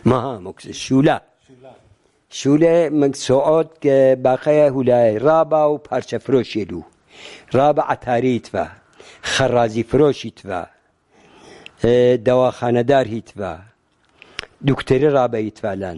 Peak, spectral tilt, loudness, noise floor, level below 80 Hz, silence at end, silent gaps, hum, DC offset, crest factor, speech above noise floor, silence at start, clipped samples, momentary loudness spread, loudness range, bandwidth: -2 dBFS; -6 dB/octave; -17 LUFS; -59 dBFS; -48 dBFS; 0 s; none; none; under 0.1%; 16 dB; 42 dB; 0.05 s; under 0.1%; 15 LU; 5 LU; 11.5 kHz